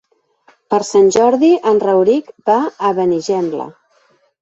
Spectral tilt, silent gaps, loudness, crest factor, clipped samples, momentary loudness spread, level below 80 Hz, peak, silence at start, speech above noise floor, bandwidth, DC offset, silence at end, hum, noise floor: -5.5 dB/octave; none; -14 LUFS; 14 dB; under 0.1%; 8 LU; -60 dBFS; -2 dBFS; 0.7 s; 43 dB; 8.2 kHz; under 0.1%; 0.7 s; none; -56 dBFS